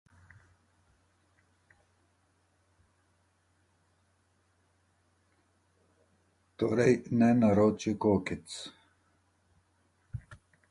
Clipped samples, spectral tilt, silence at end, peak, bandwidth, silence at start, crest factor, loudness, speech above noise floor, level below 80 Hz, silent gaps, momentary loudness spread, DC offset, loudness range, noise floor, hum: under 0.1%; -7 dB/octave; 0.35 s; -12 dBFS; 11.5 kHz; 6.6 s; 22 dB; -28 LUFS; 45 dB; -60 dBFS; none; 22 LU; under 0.1%; 6 LU; -72 dBFS; none